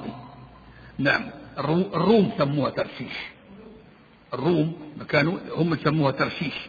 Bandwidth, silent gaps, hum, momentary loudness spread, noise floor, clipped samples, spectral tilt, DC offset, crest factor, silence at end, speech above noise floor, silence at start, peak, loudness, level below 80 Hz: 7 kHz; none; none; 17 LU; -52 dBFS; under 0.1%; -8.5 dB/octave; under 0.1%; 20 dB; 0 s; 28 dB; 0 s; -6 dBFS; -24 LUFS; -56 dBFS